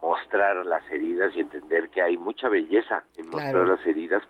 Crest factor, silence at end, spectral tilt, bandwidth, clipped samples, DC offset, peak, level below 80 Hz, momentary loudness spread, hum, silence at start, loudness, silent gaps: 14 dB; 0.05 s; -7 dB/octave; 5.6 kHz; under 0.1%; under 0.1%; -10 dBFS; -68 dBFS; 8 LU; none; 0 s; -25 LUFS; none